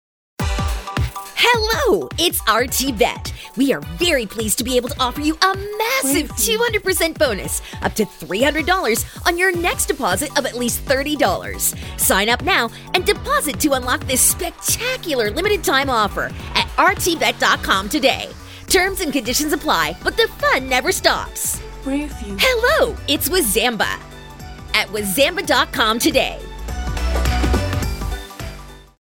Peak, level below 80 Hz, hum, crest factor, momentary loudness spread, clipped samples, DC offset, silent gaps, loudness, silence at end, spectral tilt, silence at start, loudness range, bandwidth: 0 dBFS; -32 dBFS; none; 18 dB; 9 LU; under 0.1%; under 0.1%; none; -18 LUFS; 0.2 s; -3 dB/octave; 0.4 s; 2 LU; over 20 kHz